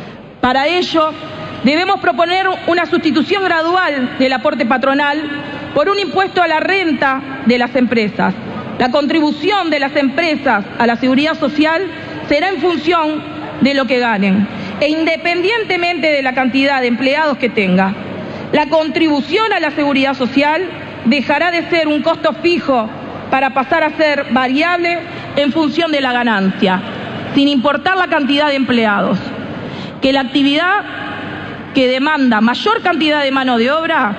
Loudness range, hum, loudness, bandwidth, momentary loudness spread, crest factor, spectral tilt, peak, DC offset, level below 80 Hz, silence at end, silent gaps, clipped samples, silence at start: 1 LU; none; -14 LUFS; 8.8 kHz; 7 LU; 12 dB; -5.5 dB/octave; -2 dBFS; under 0.1%; -50 dBFS; 0 s; none; under 0.1%; 0 s